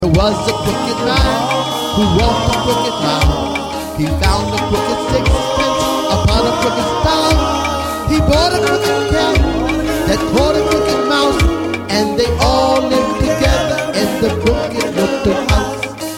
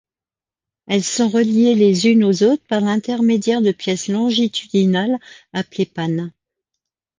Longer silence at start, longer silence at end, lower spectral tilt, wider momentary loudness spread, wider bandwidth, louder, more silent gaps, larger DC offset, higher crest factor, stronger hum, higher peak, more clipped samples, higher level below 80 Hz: second, 0 s vs 0.9 s; second, 0 s vs 0.9 s; about the same, -5 dB/octave vs -5.5 dB/octave; second, 4 LU vs 10 LU; first, 16.5 kHz vs 9.8 kHz; first, -14 LUFS vs -17 LUFS; neither; neither; about the same, 14 dB vs 14 dB; neither; first, 0 dBFS vs -4 dBFS; neither; first, -22 dBFS vs -64 dBFS